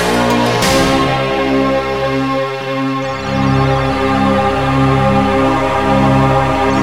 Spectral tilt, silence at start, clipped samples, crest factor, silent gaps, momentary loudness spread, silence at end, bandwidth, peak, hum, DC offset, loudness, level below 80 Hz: -5.5 dB/octave; 0 s; under 0.1%; 12 dB; none; 6 LU; 0 s; 16 kHz; 0 dBFS; none; 1%; -13 LUFS; -30 dBFS